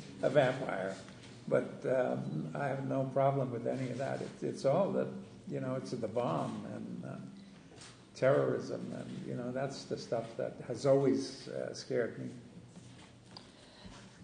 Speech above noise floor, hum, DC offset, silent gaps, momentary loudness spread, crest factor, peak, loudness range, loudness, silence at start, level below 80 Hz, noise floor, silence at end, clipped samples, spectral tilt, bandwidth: 20 dB; none; under 0.1%; none; 23 LU; 22 dB; -14 dBFS; 3 LU; -35 LUFS; 0 s; -72 dBFS; -55 dBFS; 0 s; under 0.1%; -6.5 dB/octave; 9.6 kHz